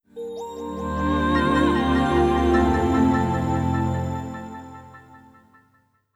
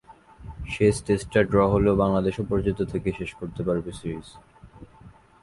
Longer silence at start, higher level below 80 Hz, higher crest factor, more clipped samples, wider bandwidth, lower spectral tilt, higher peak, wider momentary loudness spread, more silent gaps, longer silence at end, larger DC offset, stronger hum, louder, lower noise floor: about the same, 0.15 s vs 0.1 s; first, -34 dBFS vs -42 dBFS; about the same, 16 dB vs 18 dB; neither; first, 14 kHz vs 11.5 kHz; about the same, -7 dB/octave vs -7 dB/octave; about the same, -8 dBFS vs -6 dBFS; about the same, 16 LU vs 14 LU; neither; first, 1 s vs 0.35 s; neither; neither; about the same, -22 LUFS vs -24 LUFS; first, -63 dBFS vs -51 dBFS